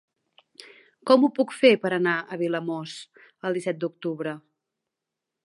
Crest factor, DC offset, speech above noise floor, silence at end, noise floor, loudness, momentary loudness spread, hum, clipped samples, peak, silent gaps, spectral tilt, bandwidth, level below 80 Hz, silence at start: 22 dB; under 0.1%; 62 dB; 1.1 s; -86 dBFS; -24 LUFS; 16 LU; none; under 0.1%; -4 dBFS; none; -5.5 dB/octave; 11.5 kHz; -82 dBFS; 1.05 s